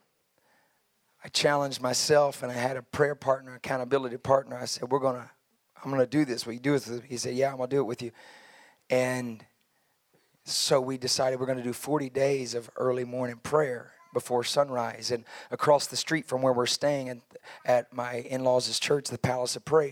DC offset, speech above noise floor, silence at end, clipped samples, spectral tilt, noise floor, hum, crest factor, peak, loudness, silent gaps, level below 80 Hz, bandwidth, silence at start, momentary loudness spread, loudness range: under 0.1%; 44 dB; 0 s; under 0.1%; -4 dB/octave; -72 dBFS; none; 20 dB; -8 dBFS; -28 LUFS; none; -70 dBFS; 17 kHz; 1.25 s; 10 LU; 3 LU